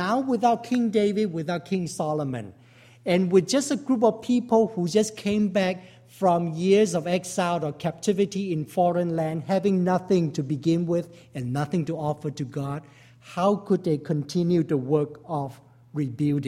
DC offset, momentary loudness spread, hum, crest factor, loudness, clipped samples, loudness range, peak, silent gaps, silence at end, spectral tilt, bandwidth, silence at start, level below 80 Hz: under 0.1%; 10 LU; none; 18 dB; -25 LUFS; under 0.1%; 4 LU; -8 dBFS; none; 0 s; -6.5 dB/octave; 14 kHz; 0 s; -64 dBFS